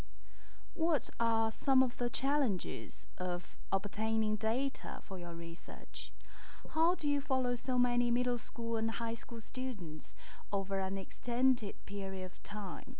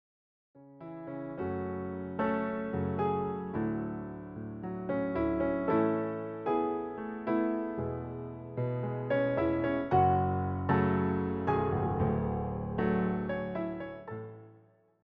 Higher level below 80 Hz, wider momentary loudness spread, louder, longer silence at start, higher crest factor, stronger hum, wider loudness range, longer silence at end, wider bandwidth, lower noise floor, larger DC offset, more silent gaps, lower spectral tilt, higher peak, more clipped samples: about the same, -56 dBFS vs -54 dBFS; first, 15 LU vs 12 LU; second, -36 LUFS vs -32 LUFS; second, 0.1 s vs 0.55 s; about the same, 16 dB vs 18 dB; neither; about the same, 3 LU vs 5 LU; second, 0.05 s vs 0.5 s; second, 4 kHz vs 5.2 kHz; second, -57 dBFS vs -62 dBFS; first, 6% vs under 0.1%; neither; first, -9.5 dB/octave vs -8 dB/octave; about the same, -16 dBFS vs -14 dBFS; neither